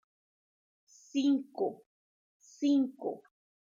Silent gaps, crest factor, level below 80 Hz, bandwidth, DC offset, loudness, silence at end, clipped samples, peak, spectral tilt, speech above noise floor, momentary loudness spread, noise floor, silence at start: 1.86-2.40 s; 16 dB; -90 dBFS; 7.4 kHz; under 0.1%; -32 LUFS; 0.5 s; under 0.1%; -20 dBFS; -5 dB/octave; over 59 dB; 12 LU; under -90 dBFS; 1.15 s